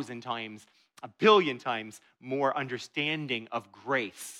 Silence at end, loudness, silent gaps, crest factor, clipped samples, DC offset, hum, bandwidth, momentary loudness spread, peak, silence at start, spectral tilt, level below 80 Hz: 0 s; -29 LUFS; none; 22 dB; under 0.1%; under 0.1%; none; 15 kHz; 21 LU; -8 dBFS; 0 s; -4.5 dB/octave; -82 dBFS